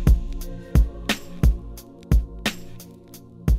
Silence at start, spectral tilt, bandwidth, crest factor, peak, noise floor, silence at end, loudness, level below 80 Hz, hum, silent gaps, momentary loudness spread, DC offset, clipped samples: 0 s; -5.5 dB/octave; 15.5 kHz; 16 dB; -6 dBFS; -44 dBFS; 0 s; -25 LUFS; -24 dBFS; none; none; 20 LU; under 0.1%; under 0.1%